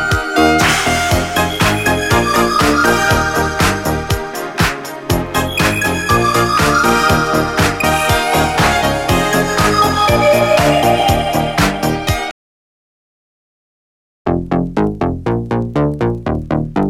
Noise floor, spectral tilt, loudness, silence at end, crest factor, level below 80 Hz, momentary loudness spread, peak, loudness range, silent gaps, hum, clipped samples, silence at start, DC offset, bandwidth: under -90 dBFS; -4.5 dB/octave; -14 LUFS; 0 s; 14 dB; -30 dBFS; 7 LU; 0 dBFS; 8 LU; 12.31-14.25 s; none; under 0.1%; 0 s; under 0.1%; 17 kHz